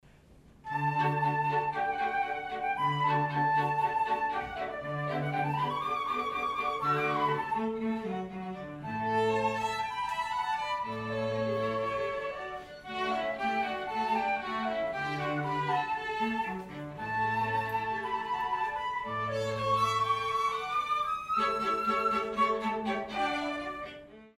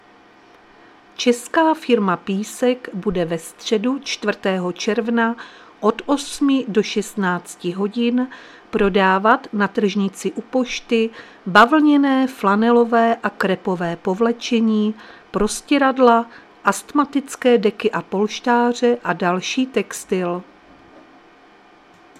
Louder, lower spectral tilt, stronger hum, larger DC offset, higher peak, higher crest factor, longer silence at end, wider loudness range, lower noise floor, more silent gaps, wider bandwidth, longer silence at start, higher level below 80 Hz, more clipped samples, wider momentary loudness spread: second, -31 LUFS vs -19 LUFS; about the same, -5.5 dB/octave vs -5 dB/octave; neither; neither; second, -16 dBFS vs 0 dBFS; about the same, 16 dB vs 20 dB; second, 0.1 s vs 1.75 s; about the same, 3 LU vs 5 LU; first, -57 dBFS vs -49 dBFS; neither; about the same, 15.5 kHz vs 14.5 kHz; second, 0.3 s vs 1.2 s; second, -62 dBFS vs -50 dBFS; neither; about the same, 8 LU vs 9 LU